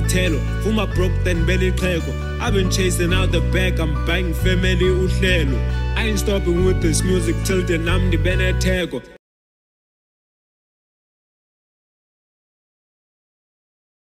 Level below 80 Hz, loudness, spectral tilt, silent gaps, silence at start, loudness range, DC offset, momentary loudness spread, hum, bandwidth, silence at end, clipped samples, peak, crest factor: -24 dBFS; -19 LUFS; -5.5 dB/octave; none; 0 s; 5 LU; under 0.1%; 4 LU; none; 15.5 kHz; 5 s; under 0.1%; -4 dBFS; 16 dB